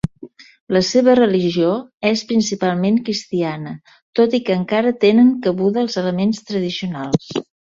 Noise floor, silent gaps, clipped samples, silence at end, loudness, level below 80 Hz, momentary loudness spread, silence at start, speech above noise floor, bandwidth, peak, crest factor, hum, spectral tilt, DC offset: -40 dBFS; 0.60-0.67 s, 1.94-1.98 s, 4.02-4.13 s; under 0.1%; 0.25 s; -17 LUFS; -52 dBFS; 11 LU; 0.05 s; 24 dB; 7.6 kHz; -2 dBFS; 16 dB; none; -6 dB/octave; under 0.1%